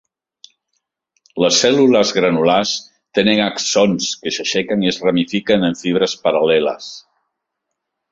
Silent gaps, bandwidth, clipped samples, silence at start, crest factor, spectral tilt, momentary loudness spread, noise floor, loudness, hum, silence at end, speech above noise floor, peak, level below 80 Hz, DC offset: none; 7.8 kHz; under 0.1%; 1.35 s; 16 dB; -3.5 dB/octave; 9 LU; -77 dBFS; -16 LUFS; none; 1.15 s; 62 dB; 0 dBFS; -56 dBFS; under 0.1%